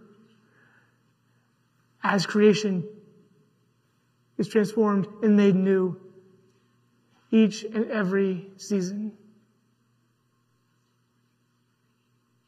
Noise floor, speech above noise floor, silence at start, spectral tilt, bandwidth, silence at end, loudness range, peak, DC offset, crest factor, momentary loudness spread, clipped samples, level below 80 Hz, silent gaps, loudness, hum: -70 dBFS; 47 dB; 2.05 s; -6.5 dB/octave; 11.5 kHz; 3.35 s; 8 LU; -8 dBFS; under 0.1%; 20 dB; 14 LU; under 0.1%; -82 dBFS; none; -24 LUFS; none